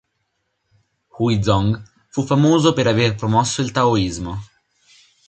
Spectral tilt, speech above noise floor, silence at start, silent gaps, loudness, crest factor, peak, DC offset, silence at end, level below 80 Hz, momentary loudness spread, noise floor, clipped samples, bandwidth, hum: -5.5 dB/octave; 54 dB; 1.15 s; none; -18 LUFS; 18 dB; 0 dBFS; under 0.1%; 0.85 s; -42 dBFS; 13 LU; -72 dBFS; under 0.1%; 9 kHz; none